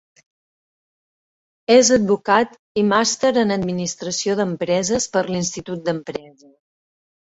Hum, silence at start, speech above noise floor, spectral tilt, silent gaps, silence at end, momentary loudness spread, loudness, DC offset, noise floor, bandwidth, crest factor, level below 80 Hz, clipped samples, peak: none; 1.7 s; over 71 dB; -4 dB/octave; 2.59-2.75 s; 1.15 s; 11 LU; -19 LUFS; under 0.1%; under -90 dBFS; 8 kHz; 18 dB; -56 dBFS; under 0.1%; -2 dBFS